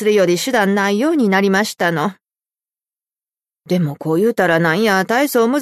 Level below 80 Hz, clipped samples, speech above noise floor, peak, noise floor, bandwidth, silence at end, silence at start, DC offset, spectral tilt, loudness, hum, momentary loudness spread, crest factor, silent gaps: -64 dBFS; under 0.1%; over 75 dB; -2 dBFS; under -90 dBFS; 13.5 kHz; 0 s; 0 s; under 0.1%; -5 dB/octave; -16 LUFS; none; 5 LU; 14 dB; none